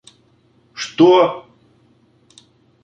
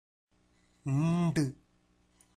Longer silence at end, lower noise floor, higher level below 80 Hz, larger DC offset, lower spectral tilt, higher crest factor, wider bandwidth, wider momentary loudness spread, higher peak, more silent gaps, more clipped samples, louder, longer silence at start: first, 1.45 s vs 0.8 s; second, -56 dBFS vs -69 dBFS; about the same, -66 dBFS vs -64 dBFS; neither; second, -5.5 dB/octave vs -7 dB/octave; about the same, 18 dB vs 14 dB; second, 8.8 kHz vs 11.5 kHz; first, 23 LU vs 8 LU; first, 0 dBFS vs -20 dBFS; neither; neither; first, -14 LUFS vs -31 LUFS; about the same, 0.8 s vs 0.85 s